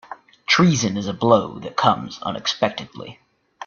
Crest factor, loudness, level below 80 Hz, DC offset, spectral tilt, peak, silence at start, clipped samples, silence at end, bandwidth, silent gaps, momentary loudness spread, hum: 20 dB; -20 LUFS; -56 dBFS; under 0.1%; -4.5 dB/octave; 0 dBFS; 0.1 s; under 0.1%; 0 s; 7.2 kHz; none; 20 LU; none